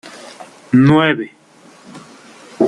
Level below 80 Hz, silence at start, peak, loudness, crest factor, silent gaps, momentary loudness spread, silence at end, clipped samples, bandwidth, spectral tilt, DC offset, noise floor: -54 dBFS; 0.05 s; -2 dBFS; -13 LUFS; 16 dB; none; 24 LU; 0 s; under 0.1%; 11 kHz; -7 dB/octave; under 0.1%; -45 dBFS